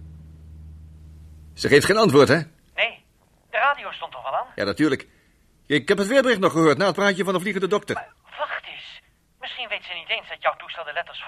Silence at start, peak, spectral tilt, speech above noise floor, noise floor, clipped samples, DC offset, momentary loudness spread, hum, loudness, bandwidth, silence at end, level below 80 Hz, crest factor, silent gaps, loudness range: 0 s; -2 dBFS; -5 dB/octave; 39 dB; -60 dBFS; under 0.1%; under 0.1%; 16 LU; none; -22 LUFS; 15 kHz; 0 s; -54 dBFS; 22 dB; none; 7 LU